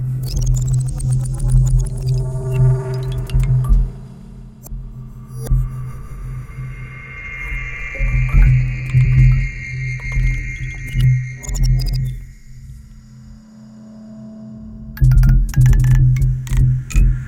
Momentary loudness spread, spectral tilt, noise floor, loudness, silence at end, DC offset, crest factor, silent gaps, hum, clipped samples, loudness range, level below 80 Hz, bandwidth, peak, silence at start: 21 LU; -6.5 dB/octave; -39 dBFS; -18 LUFS; 0 s; under 0.1%; 16 dB; none; none; under 0.1%; 10 LU; -20 dBFS; 15.5 kHz; -2 dBFS; 0 s